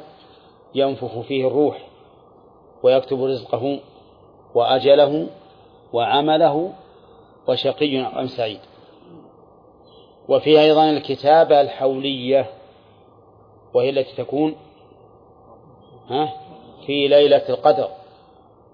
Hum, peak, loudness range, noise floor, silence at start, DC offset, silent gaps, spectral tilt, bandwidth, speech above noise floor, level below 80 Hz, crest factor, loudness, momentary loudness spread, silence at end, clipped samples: none; -2 dBFS; 9 LU; -50 dBFS; 0 s; under 0.1%; none; -7.5 dB/octave; 5.2 kHz; 33 dB; -64 dBFS; 18 dB; -19 LUFS; 14 LU; 0.75 s; under 0.1%